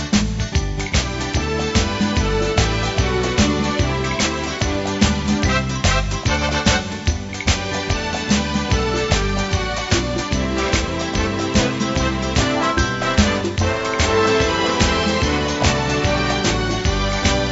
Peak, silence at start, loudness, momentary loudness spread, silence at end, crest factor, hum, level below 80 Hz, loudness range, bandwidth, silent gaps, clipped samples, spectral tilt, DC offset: 0 dBFS; 0 s; -19 LUFS; 4 LU; 0 s; 18 dB; none; -26 dBFS; 2 LU; 8 kHz; none; under 0.1%; -4.5 dB/octave; under 0.1%